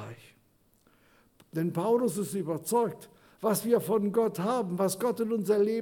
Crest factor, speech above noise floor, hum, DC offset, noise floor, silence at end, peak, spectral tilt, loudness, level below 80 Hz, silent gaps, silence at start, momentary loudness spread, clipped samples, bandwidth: 18 dB; 38 dB; none; under 0.1%; -66 dBFS; 0 s; -12 dBFS; -6 dB/octave; -29 LUFS; -76 dBFS; none; 0 s; 7 LU; under 0.1%; 19 kHz